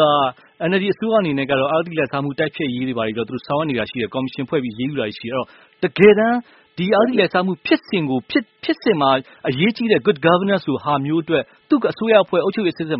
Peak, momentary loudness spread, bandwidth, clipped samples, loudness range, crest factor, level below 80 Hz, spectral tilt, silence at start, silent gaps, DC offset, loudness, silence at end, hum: 0 dBFS; 9 LU; 5.8 kHz; under 0.1%; 5 LU; 18 dB; -58 dBFS; -4 dB/octave; 0 s; none; under 0.1%; -19 LUFS; 0 s; none